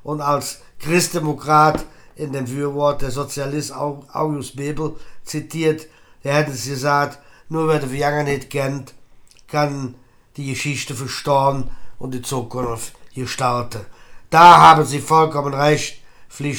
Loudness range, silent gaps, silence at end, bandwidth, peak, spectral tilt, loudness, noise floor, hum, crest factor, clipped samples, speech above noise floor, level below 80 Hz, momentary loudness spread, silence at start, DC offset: 10 LU; none; 0 s; 20 kHz; 0 dBFS; -5 dB/octave; -18 LUFS; -45 dBFS; none; 18 dB; under 0.1%; 27 dB; -42 dBFS; 15 LU; 0.05 s; under 0.1%